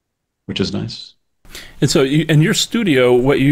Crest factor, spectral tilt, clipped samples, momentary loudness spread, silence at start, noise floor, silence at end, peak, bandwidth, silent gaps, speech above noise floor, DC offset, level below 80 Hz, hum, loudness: 12 dB; -5 dB/octave; under 0.1%; 17 LU; 0.5 s; -38 dBFS; 0 s; -4 dBFS; 16 kHz; none; 24 dB; under 0.1%; -40 dBFS; none; -15 LUFS